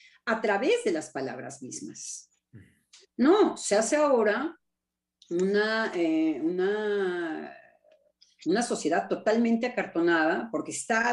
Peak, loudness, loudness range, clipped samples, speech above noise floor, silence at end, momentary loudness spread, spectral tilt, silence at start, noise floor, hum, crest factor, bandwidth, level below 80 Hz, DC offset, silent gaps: -10 dBFS; -27 LUFS; 3 LU; under 0.1%; 60 dB; 0 s; 15 LU; -4 dB/octave; 0.25 s; -86 dBFS; none; 18 dB; 11.5 kHz; -76 dBFS; under 0.1%; none